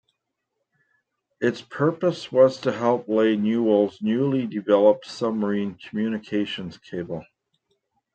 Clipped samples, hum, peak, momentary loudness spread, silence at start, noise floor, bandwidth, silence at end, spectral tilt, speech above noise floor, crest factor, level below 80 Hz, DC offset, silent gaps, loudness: under 0.1%; none; -4 dBFS; 13 LU; 1.4 s; -79 dBFS; 8.8 kHz; 0.9 s; -7 dB/octave; 57 dB; 20 dB; -68 dBFS; under 0.1%; none; -23 LUFS